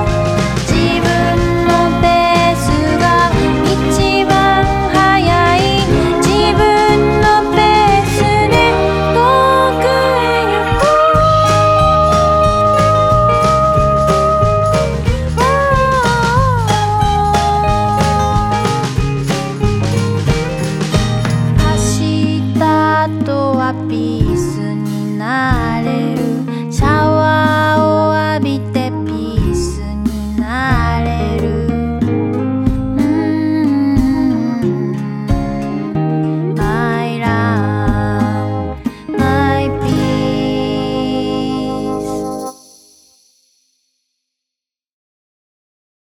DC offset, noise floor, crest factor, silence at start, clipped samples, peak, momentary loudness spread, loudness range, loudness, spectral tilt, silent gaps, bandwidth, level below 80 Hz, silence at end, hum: under 0.1%; -84 dBFS; 12 dB; 0 s; under 0.1%; 0 dBFS; 8 LU; 6 LU; -13 LUFS; -6 dB/octave; none; 16.5 kHz; -26 dBFS; 3.5 s; none